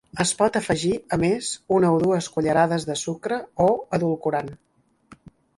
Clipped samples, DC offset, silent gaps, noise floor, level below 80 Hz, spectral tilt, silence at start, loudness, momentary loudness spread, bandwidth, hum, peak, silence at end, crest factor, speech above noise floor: under 0.1%; under 0.1%; none; -53 dBFS; -54 dBFS; -5 dB/octave; 0.15 s; -23 LUFS; 8 LU; 11.5 kHz; none; -6 dBFS; 0.45 s; 18 dB; 30 dB